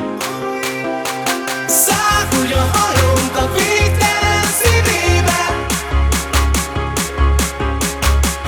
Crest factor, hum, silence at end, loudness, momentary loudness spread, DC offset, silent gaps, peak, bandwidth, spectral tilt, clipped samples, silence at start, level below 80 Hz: 14 dB; none; 0 s; -15 LUFS; 7 LU; under 0.1%; none; 0 dBFS; over 20 kHz; -3.5 dB/octave; under 0.1%; 0 s; -22 dBFS